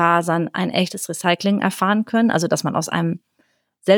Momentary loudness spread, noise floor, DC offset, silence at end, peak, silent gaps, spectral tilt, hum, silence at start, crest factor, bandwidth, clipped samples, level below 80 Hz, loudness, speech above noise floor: 6 LU; -65 dBFS; under 0.1%; 0 s; -2 dBFS; none; -5 dB/octave; none; 0 s; 18 dB; 20 kHz; under 0.1%; -70 dBFS; -20 LUFS; 46 dB